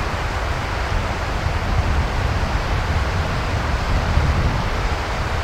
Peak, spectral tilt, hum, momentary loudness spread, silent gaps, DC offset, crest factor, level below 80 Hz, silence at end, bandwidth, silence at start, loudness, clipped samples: -4 dBFS; -5.5 dB/octave; none; 4 LU; none; under 0.1%; 16 dB; -24 dBFS; 0 s; 14.5 kHz; 0 s; -22 LUFS; under 0.1%